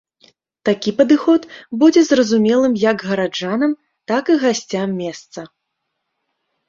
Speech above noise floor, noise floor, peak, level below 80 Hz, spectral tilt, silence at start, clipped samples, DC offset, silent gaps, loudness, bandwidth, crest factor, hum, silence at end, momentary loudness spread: 59 dB; -75 dBFS; -2 dBFS; -62 dBFS; -5 dB/octave; 0.65 s; under 0.1%; under 0.1%; none; -16 LUFS; 7.6 kHz; 16 dB; none; 1.25 s; 15 LU